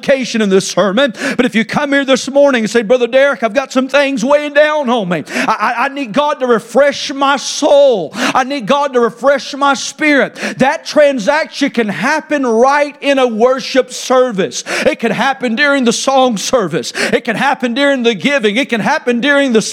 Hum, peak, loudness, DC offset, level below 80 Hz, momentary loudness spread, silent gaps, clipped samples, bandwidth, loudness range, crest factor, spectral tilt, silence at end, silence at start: none; 0 dBFS; -12 LUFS; under 0.1%; -56 dBFS; 4 LU; none; under 0.1%; 15 kHz; 1 LU; 12 dB; -3.5 dB/octave; 0 s; 0 s